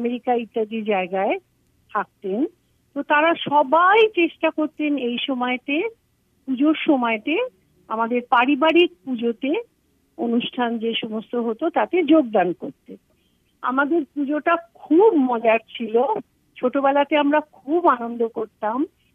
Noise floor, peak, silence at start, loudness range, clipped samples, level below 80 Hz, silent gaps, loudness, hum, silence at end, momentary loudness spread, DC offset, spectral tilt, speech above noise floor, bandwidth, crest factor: -64 dBFS; -4 dBFS; 0 s; 3 LU; under 0.1%; -72 dBFS; none; -21 LUFS; none; 0.25 s; 11 LU; under 0.1%; -7 dB/octave; 43 dB; 3.9 kHz; 16 dB